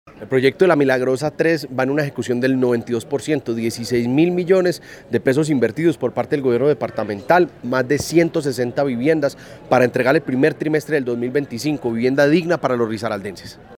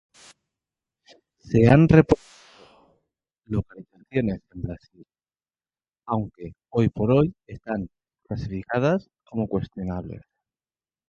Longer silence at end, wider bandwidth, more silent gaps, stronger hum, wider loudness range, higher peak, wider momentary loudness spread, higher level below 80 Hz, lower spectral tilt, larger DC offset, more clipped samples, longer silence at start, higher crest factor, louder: second, 0.05 s vs 0.9 s; first, 18 kHz vs 8 kHz; neither; neither; second, 1 LU vs 11 LU; about the same, 0 dBFS vs -2 dBFS; second, 7 LU vs 20 LU; second, -56 dBFS vs -46 dBFS; second, -6 dB/octave vs -9 dB/octave; neither; neither; second, 0.05 s vs 1.45 s; second, 18 dB vs 24 dB; first, -19 LUFS vs -23 LUFS